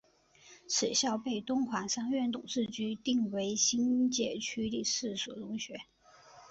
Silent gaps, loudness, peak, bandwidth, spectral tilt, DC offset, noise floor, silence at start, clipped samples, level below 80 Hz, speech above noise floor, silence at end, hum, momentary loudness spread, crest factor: none; -33 LUFS; -16 dBFS; 8.2 kHz; -2.5 dB/octave; under 0.1%; -62 dBFS; 0.45 s; under 0.1%; -70 dBFS; 29 dB; 0 s; none; 10 LU; 18 dB